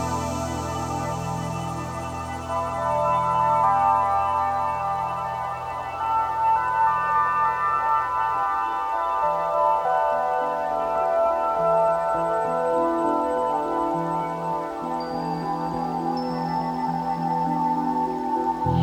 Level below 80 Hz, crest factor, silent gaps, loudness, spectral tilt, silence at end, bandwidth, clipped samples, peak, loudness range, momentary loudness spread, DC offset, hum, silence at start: -48 dBFS; 14 dB; none; -24 LUFS; -6 dB/octave; 0 s; 18 kHz; under 0.1%; -10 dBFS; 4 LU; 8 LU; under 0.1%; none; 0 s